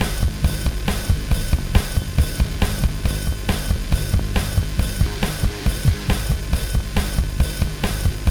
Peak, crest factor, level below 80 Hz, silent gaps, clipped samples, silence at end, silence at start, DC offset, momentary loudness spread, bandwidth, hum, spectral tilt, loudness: 0 dBFS; 18 dB; -22 dBFS; none; under 0.1%; 0 s; 0 s; under 0.1%; 3 LU; over 20 kHz; none; -5 dB/octave; -22 LUFS